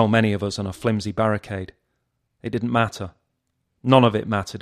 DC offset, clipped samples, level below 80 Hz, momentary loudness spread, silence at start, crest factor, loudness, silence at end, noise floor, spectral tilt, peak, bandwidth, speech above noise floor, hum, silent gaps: under 0.1%; under 0.1%; -54 dBFS; 18 LU; 0 s; 22 dB; -22 LUFS; 0 s; -74 dBFS; -6.5 dB/octave; 0 dBFS; 13.5 kHz; 54 dB; none; none